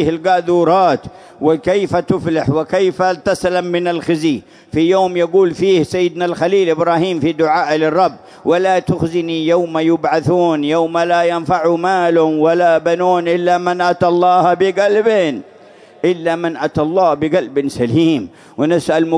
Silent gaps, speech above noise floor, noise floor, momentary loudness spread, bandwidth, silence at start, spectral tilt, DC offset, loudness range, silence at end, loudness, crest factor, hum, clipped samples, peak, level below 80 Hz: none; 28 dB; -42 dBFS; 5 LU; 11 kHz; 0 s; -6.5 dB/octave; under 0.1%; 3 LU; 0 s; -15 LUFS; 14 dB; none; under 0.1%; 0 dBFS; -50 dBFS